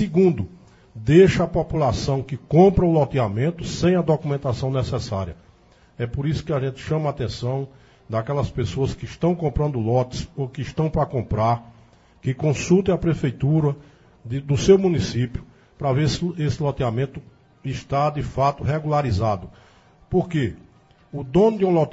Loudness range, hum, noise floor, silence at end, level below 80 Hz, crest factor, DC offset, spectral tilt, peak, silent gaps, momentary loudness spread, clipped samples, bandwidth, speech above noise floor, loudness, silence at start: 7 LU; none; -53 dBFS; 0 s; -40 dBFS; 20 dB; under 0.1%; -7.5 dB/octave; -2 dBFS; none; 13 LU; under 0.1%; 8 kHz; 33 dB; -22 LUFS; 0 s